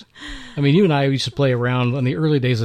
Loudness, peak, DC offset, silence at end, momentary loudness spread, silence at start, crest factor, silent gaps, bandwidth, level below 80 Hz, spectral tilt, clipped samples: -18 LUFS; -6 dBFS; under 0.1%; 0 s; 14 LU; 0 s; 12 dB; none; 9.6 kHz; -46 dBFS; -7 dB/octave; under 0.1%